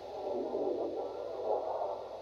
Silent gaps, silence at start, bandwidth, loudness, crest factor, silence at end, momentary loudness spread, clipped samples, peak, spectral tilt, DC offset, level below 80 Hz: none; 0 s; 7.6 kHz; -37 LUFS; 16 dB; 0 s; 4 LU; under 0.1%; -20 dBFS; -6.5 dB/octave; under 0.1%; -70 dBFS